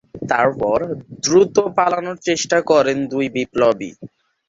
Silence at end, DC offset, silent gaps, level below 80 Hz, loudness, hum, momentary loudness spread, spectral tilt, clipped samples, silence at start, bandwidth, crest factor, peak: 0.4 s; under 0.1%; none; -54 dBFS; -18 LUFS; none; 8 LU; -4 dB/octave; under 0.1%; 0.15 s; 7.8 kHz; 16 dB; -2 dBFS